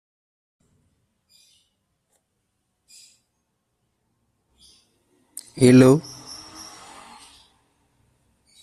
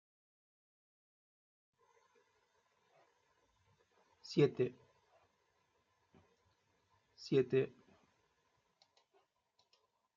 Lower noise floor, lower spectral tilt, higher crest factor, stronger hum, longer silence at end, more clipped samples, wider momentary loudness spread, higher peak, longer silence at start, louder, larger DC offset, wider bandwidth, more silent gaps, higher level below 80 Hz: second, -75 dBFS vs -80 dBFS; about the same, -6.5 dB/octave vs -6.5 dB/octave; about the same, 24 dB vs 26 dB; neither; first, 2.65 s vs 2.5 s; neither; first, 30 LU vs 9 LU; first, -2 dBFS vs -18 dBFS; first, 5.55 s vs 4.25 s; first, -15 LUFS vs -36 LUFS; neither; first, 13 kHz vs 7.2 kHz; neither; first, -60 dBFS vs -86 dBFS